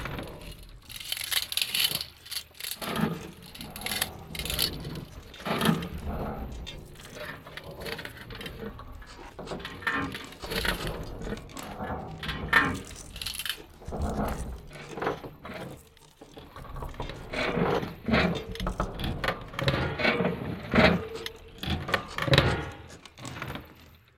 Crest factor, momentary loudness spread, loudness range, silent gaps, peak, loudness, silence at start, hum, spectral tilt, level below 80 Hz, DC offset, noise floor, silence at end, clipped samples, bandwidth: 26 dB; 19 LU; 10 LU; none; -6 dBFS; -30 LUFS; 0 s; none; -4 dB/octave; -44 dBFS; under 0.1%; -53 dBFS; 0.2 s; under 0.1%; 17 kHz